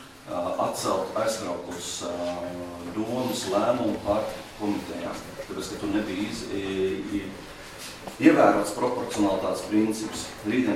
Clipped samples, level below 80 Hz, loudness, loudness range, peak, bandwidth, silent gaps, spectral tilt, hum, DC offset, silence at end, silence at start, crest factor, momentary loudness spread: under 0.1%; -54 dBFS; -27 LUFS; 6 LU; -4 dBFS; 16 kHz; none; -4.5 dB/octave; none; under 0.1%; 0 s; 0 s; 22 dB; 13 LU